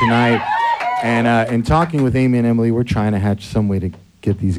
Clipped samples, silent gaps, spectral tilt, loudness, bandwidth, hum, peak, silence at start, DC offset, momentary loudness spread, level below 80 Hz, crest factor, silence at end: under 0.1%; none; -7.5 dB/octave; -17 LUFS; 12 kHz; none; -2 dBFS; 0 s; under 0.1%; 5 LU; -36 dBFS; 14 dB; 0 s